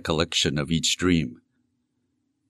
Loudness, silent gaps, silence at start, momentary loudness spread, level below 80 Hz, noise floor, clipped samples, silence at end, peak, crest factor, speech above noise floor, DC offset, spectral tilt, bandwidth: -23 LUFS; none; 0.05 s; 3 LU; -46 dBFS; -74 dBFS; under 0.1%; 1.15 s; -6 dBFS; 20 dB; 50 dB; under 0.1%; -4 dB/octave; 13 kHz